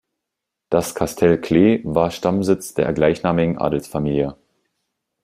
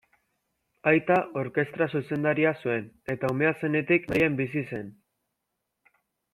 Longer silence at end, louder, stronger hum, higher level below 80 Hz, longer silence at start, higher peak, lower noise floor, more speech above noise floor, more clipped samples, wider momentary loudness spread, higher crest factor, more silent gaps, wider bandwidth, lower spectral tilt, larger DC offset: second, 0.9 s vs 1.4 s; first, -19 LUFS vs -26 LUFS; neither; first, -46 dBFS vs -62 dBFS; second, 0.7 s vs 0.85 s; first, -2 dBFS vs -8 dBFS; about the same, -82 dBFS vs -82 dBFS; first, 64 dB vs 56 dB; neither; about the same, 7 LU vs 9 LU; about the same, 18 dB vs 20 dB; neither; about the same, 15.5 kHz vs 14.5 kHz; second, -6.5 dB/octave vs -8 dB/octave; neither